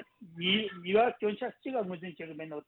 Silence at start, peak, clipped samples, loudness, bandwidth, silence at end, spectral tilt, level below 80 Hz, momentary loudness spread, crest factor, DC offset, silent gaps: 0 s; -16 dBFS; under 0.1%; -31 LUFS; 4.2 kHz; 0.05 s; -8 dB/octave; -74 dBFS; 15 LU; 18 dB; under 0.1%; none